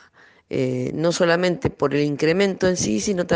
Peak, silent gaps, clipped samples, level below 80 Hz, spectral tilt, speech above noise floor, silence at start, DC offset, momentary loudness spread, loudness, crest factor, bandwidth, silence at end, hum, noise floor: -4 dBFS; none; under 0.1%; -50 dBFS; -5 dB/octave; 32 dB; 0.5 s; under 0.1%; 5 LU; -21 LUFS; 18 dB; 10 kHz; 0 s; none; -53 dBFS